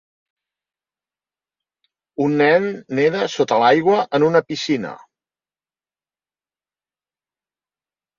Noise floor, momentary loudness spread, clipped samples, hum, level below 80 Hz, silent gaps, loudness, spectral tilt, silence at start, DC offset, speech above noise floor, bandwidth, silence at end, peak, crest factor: under -90 dBFS; 9 LU; under 0.1%; none; -66 dBFS; none; -17 LUFS; -5.5 dB/octave; 2.2 s; under 0.1%; over 73 dB; 7.4 kHz; 3.25 s; -2 dBFS; 20 dB